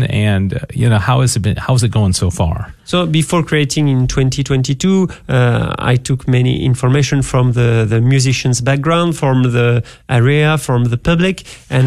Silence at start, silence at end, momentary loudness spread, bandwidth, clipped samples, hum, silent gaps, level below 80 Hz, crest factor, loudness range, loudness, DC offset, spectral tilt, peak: 0 s; 0 s; 4 LU; 13 kHz; under 0.1%; none; none; -34 dBFS; 12 dB; 2 LU; -14 LUFS; under 0.1%; -6 dB/octave; -2 dBFS